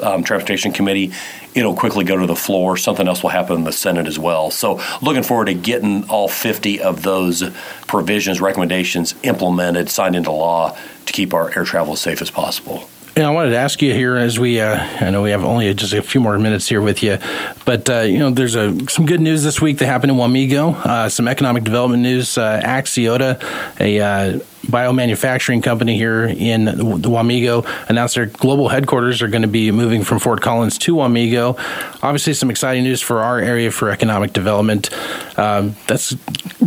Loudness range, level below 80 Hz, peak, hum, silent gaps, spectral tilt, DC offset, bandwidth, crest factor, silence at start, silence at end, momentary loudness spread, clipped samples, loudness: 2 LU; -50 dBFS; 0 dBFS; none; none; -5 dB/octave; under 0.1%; 17.5 kHz; 16 dB; 0 s; 0 s; 5 LU; under 0.1%; -16 LUFS